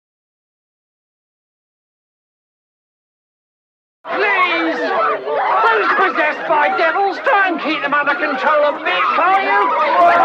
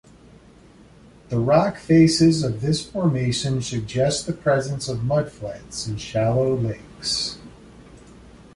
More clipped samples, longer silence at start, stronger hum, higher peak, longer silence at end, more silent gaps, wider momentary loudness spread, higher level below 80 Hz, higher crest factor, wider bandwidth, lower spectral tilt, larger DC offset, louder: neither; first, 4.05 s vs 1.3 s; neither; about the same, -4 dBFS vs -4 dBFS; second, 0 s vs 0.55 s; neither; second, 4 LU vs 13 LU; second, -70 dBFS vs -48 dBFS; about the same, 14 dB vs 18 dB; second, 8 kHz vs 11.5 kHz; second, -4 dB/octave vs -5.5 dB/octave; neither; first, -15 LUFS vs -22 LUFS